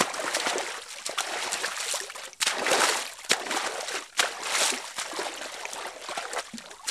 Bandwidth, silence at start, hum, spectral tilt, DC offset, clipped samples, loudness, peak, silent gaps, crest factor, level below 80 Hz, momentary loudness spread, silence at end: 15.5 kHz; 0 s; none; 0.5 dB/octave; under 0.1%; under 0.1%; -28 LUFS; -6 dBFS; none; 24 dB; -72 dBFS; 11 LU; 0 s